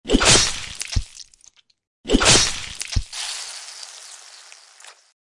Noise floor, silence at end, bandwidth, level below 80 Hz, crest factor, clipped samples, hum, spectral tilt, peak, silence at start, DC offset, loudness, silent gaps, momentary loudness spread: -55 dBFS; 0.3 s; 11.5 kHz; -32 dBFS; 22 dB; under 0.1%; none; -2 dB/octave; 0 dBFS; 0.05 s; under 0.1%; -18 LUFS; 1.87-2.04 s; 24 LU